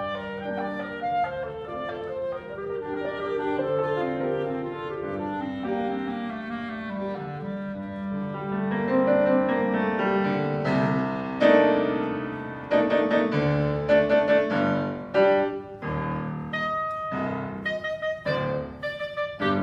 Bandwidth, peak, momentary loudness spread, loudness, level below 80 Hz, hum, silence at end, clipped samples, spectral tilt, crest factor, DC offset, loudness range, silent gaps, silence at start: 7.6 kHz; -6 dBFS; 12 LU; -26 LUFS; -54 dBFS; none; 0 s; under 0.1%; -8 dB/octave; 18 dB; under 0.1%; 8 LU; none; 0 s